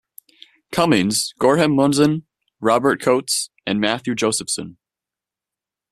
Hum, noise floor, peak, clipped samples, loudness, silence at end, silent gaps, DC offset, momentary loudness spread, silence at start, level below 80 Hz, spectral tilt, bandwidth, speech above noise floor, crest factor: none; -88 dBFS; -2 dBFS; under 0.1%; -19 LUFS; 1.2 s; none; under 0.1%; 9 LU; 0.7 s; -56 dBFS; -4 dB/octave; 14 kHz; 70 dB; 18 dB